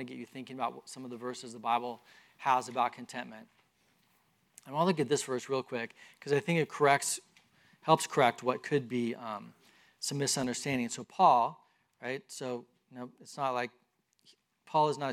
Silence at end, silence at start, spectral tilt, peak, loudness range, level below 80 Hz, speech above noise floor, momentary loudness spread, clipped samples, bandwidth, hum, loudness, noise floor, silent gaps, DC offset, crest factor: 0 s; 0 s; -4 dB/octave; -10 dBFS; 5 LU; -80 dBFS; 39 dB; 17 LU; under 0.1%; 16 kHz; none; -32 LUFS; -72 dBFS; none; under 0.1%; 22 dB